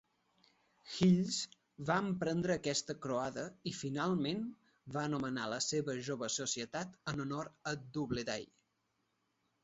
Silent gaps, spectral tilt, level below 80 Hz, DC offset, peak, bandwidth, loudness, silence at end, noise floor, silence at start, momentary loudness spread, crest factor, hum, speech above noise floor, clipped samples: none; -5 dB/octave; -70 dBFS; under 0.1%; -18 dBFS; 8 kHz; -37 LUFS; 1.2 s; -82 dBFS; 0.85 s; 10 LU; 20 dB; none; 45 dB; under 0.1%